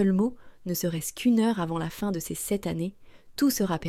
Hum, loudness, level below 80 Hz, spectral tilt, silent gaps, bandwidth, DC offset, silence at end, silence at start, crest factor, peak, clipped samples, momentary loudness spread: none; -28 LUFS; -54 dBFS; -5.5 dB/octave; none; 16.5 kHz; under 0.1%; 0 s; 0 s; 14 dB; -14 dBFS; under 0.1%; 9 LU